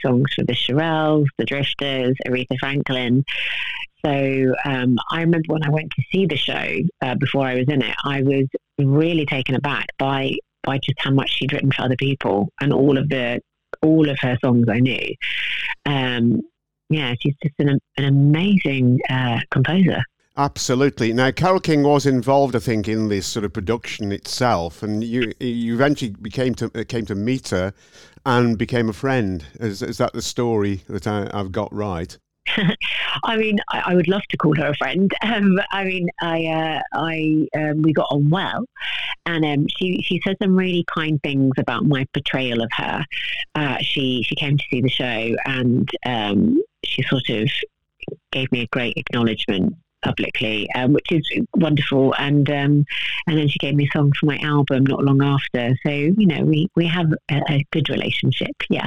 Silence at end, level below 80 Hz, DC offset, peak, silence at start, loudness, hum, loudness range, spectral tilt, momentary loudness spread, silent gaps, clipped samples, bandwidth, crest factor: 0 s; -50 dBFS; 0.8%; -4 dBFS; 0 s; -20 LUFS; none; 4 LU; -6.5 dB/octave; 7 LU; none; under 0.1%; 12 kHz; 16 dB